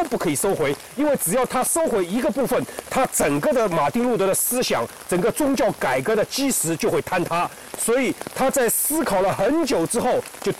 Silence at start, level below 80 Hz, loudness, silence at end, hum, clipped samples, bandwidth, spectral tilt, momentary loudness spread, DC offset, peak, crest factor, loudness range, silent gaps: 0 s; -50 dBFS; -21 LUFS; 0 s; none; under 0.1%; 16.5 kHz; -3.5 dB/octave; 4 LU; 0.2%; -12 dBFS; 10 dB; 1 LU; none